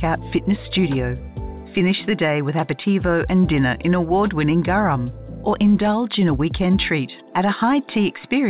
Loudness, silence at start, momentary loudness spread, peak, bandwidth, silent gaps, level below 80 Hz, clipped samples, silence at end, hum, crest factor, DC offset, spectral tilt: -20 LUFS; 0 s; 7 LU; -8 dBFS; 4 kHz; none; -36 dBFS; under 0.1%; 0 s; none; 10 dB; 0.1%; -11 dB/octave